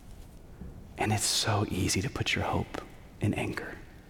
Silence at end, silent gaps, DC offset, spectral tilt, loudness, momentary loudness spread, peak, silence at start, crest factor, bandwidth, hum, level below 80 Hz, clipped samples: 0 s; none; under 0.1%; -3.5 dB/octave; -30 LUFS; 21 LU; -16 dBFS; 0 s; 16 dB; 18 kHz; none; -50 dBFS; under 0.1%